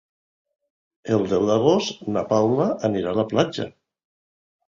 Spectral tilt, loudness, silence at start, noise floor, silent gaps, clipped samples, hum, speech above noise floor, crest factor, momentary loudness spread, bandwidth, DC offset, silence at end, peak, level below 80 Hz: -6 dB/octave; -22 LUFS; 1.05 s; under -90 dBFS; none; under 0.1%; none; over 69 dB; 20 dB; 9 LU; 7.6 kHz; under 0.1%; 1 s; -4 dBFS; -56 dBFS